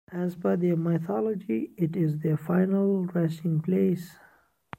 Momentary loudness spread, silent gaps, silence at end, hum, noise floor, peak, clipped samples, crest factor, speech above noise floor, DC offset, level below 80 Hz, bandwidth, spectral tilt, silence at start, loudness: 5 LU; none; 0.65 s; none; -49 dBFS; -12 dBFS; under 0.1%; 16 dB; 22 dB; under 0.1%; -70 dBFS; 15.5 kHz; -9.5 dB/octave; 0.1 s; -27 LUFS